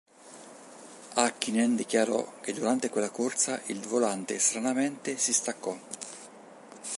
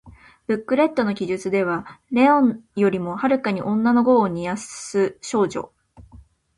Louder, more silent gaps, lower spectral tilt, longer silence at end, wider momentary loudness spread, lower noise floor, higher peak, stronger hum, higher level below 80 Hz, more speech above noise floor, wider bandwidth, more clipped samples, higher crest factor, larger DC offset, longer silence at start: second, -28 LUFS vs -21 LUFS; neither; second, -2.5 dB/octave vs -6 dB/octave; second, 0 s vs 0.4 s; first, 22 LU vs 11 LU; about the same, -50 dBFS vs -49 dBFS; second, -8 dBFS vs -4 dBFS; neither; second, -80 dBFS vs -56 dBFS; second, 21 dB vs 29 dB; about the same, 11.5 kHz vs 11.5 kHz; neither; first, 24 dB vs 16 dB; neither; first, 0.25 s vs 0.05 s